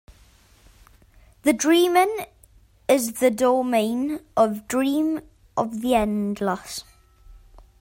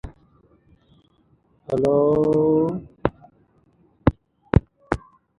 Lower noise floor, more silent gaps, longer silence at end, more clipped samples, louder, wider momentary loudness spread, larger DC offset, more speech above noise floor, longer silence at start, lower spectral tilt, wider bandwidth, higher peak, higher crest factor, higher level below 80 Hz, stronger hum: second, -54 dBFS vs -61 dBFS; neither; about the same, 0.45 s vs 0.4 s; neither; about the same, -22 LUFS vs -22 LUFS; about the same, 13 LU vs 11 LU; neither; second, 33 dB vs 42 dB; first, 1.45 s vs 0.05 s; second, -4 dB/octave vs -9.5 dB/octave; first, 16.5 kHz vs 10.5 kHz; second, -6 dBFS vs 0 dBFS; second, 18 dB vs 24 dB; second, -52 dBFS vs -38 dBFS; neither